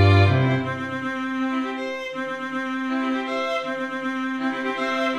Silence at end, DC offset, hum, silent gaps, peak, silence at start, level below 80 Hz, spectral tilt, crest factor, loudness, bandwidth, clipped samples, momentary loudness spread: 0 s; 0.1%; none; none; -4 dBFS; 0 s; -60 dBFS; -7 dB/octave; 18 dB; -24 LUFS; 8.6 kHz; under 0.1%; 9 LU